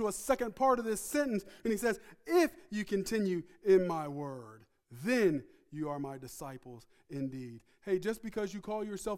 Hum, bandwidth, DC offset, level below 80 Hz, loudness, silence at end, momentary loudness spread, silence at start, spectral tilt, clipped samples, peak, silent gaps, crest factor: none; 16 kHz; under 0.1%; -62 dBFS; -34 LUFS; 0 s; 16 LU; 0 s; -5 dB/octave; under 0.1%; -16 dBFS; none; 18 dB